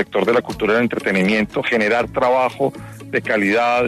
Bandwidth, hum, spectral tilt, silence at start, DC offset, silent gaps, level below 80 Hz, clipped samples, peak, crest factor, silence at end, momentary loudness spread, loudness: 13.5 kHz; none; -6 dB/octave; 0 s; under 0.1%; none; -48 dBFS; under 0.1%; -4 dBFS; 14 dB; 0 s; 7 LU; -18 LUFS